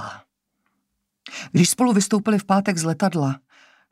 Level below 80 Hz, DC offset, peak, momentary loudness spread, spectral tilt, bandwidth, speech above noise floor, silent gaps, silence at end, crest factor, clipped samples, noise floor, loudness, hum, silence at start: -68 dBFS; under 0.1%; -4 dBFS; 17 LU; -5 dB/octave; 15.5 kHz; 56 dB; none; 0.55 s; 18 dB; under 0.1%; -76 dBFS; -20 LUFS; none; 0 s